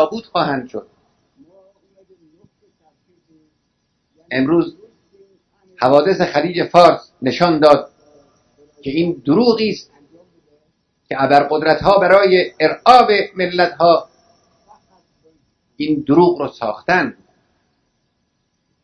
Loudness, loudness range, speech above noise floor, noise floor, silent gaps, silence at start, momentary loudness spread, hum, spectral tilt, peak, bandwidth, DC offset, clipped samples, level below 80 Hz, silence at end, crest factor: -15 LUFS; 11 LU; 54 dB; -68 dBFS; none; 0 s; 13 LU; none; -6 dB/octave; 0 dBFS; 11 kHz; under 0.1%; 0.2%; -52 dBFS; 1.75 s; 18 dB